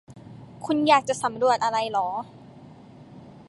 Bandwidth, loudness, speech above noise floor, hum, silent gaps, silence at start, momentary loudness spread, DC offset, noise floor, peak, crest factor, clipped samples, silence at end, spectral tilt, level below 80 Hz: 11.5 kHz; -23 LUFS; 24 dB; none; none; 0.1 s; 23 LU; under 0.1%; -47 dBFS; -6 dBFS; 20 dB; under 0.1%; 0.2 s; -4 dB/octave; -64 dBFS